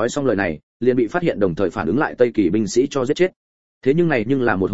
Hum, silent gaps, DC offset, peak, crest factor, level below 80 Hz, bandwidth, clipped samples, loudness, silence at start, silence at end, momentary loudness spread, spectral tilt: none; 0.63-0.80 s, 3.36-3.81 s; 0.9%; -2 dBFS; 18 dB; -48 dBFS; 8 kHz; under 0.1%; -19 LUFS; 0 s; 0 s; 4 LU; -6 dB/octave